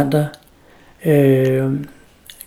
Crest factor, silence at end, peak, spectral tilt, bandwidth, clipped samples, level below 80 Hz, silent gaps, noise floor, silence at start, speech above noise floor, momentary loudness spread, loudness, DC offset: 16 dB; 0.6 s; -2 dBFS; -8 dB/octave; 15.5 kHz; under 0.1%; -52 dBFS; none; -48 dBFS; 0 s; 33 dB; 13 LU; -17 LUFS; under 0.1%